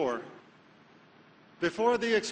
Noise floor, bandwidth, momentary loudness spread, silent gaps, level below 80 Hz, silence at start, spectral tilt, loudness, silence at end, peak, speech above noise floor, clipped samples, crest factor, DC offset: -58 dBFS; 9.4 kHz; 13 LU; none; -68 dBFS; 0 s; -4 dB/octave; -30 LUFS; 0 s; -14 dBFS; 29 dB; under 0.1%; 18 dB; under 0.1%